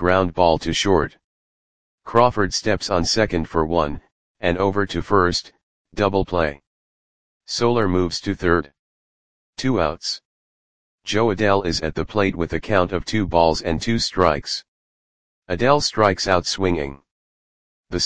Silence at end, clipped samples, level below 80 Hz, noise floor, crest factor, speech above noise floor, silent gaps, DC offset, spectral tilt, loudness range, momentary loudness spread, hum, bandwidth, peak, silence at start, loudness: 0 s; under 0.1%; -40 dBFS; under -90 dBFS; 20 dB; over 70 dB; 1.24-1.98 s, 4.12-4.35 s, 5.63-5.85 s, 6.67-7.40 s, 8.79-9.53 s, 10.25-10.98 s, 14.68-15.42 s, 17.11-17.84 s; 2%; -4.5 dB/octave; 3 LU; 10 LU; none; 10 kHz; 0 dBFS; 0 s; -20 LUFS